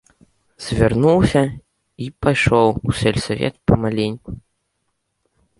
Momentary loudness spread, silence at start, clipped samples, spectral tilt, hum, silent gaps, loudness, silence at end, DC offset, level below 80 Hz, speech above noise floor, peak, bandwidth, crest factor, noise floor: 18 LU; 0.6 s; under 0.1%; -6.5 dB/octave; none; none; -18 LUFS; 1.2 s; under 0.1%; -36 dBFS; 55 dB; -2 dBFS; 11.5 kHz; 18 dB; -72 dBFS